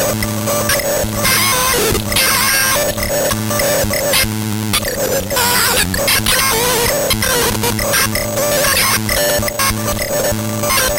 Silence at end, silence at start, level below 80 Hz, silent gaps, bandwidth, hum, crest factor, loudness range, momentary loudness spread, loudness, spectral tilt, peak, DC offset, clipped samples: 0 s; 0 s; -32 dBFS; none; 17.5 kHz; none; 14 dB; 1 LU; 5 LU; -13 LUFS; -2.5 dB/octave; 0 dBFS; under 0.1%; under 0.1%